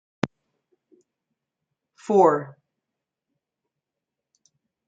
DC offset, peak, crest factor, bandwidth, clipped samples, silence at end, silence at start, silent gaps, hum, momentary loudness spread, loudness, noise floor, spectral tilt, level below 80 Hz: under 0.1%; -4 dBFS; 24 dB; 8 kHz; under 0.1%; 2.35 s; 0.25 s; none; none; 24 LU; -22 LUFS; -86 dBFS; -7 dB/octave; -76 dBFS